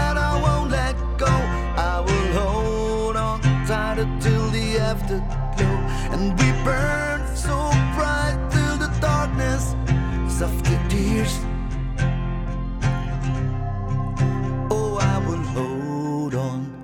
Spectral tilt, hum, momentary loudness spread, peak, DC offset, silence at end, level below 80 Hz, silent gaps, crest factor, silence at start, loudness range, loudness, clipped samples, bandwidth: -6 dB/octave; none; 6 LU; -4 dBFS; under 0.1%; 0 s; -26 dBFS; none; 16 dB; 0 s; 3 LU; -23 LUFS; under 0.1%; 16 kHz